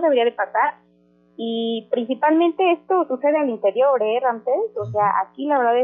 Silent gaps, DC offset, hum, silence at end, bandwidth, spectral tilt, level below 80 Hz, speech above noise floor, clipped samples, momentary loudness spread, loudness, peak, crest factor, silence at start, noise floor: none; under 0.1%; 60 Hz at -55 dBFS; 0 s; 3.9 kHz; -8.5 dB/octave; -70 dBFS; 38 dB; under 0.1%; 7 LU; -20 LUFS; -6 dBFS; 14 dB; 0 s; -57 dBFS